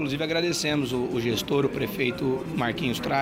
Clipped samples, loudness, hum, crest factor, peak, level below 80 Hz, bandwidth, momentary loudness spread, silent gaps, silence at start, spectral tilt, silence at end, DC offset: under 0.1%; -26 LUFS; none; 16 dB; -10 dBFS; -52 dBFS; 16 kHz; 3 LU; none; 0 s; -5 dB/octave; 0 s; under 0.1%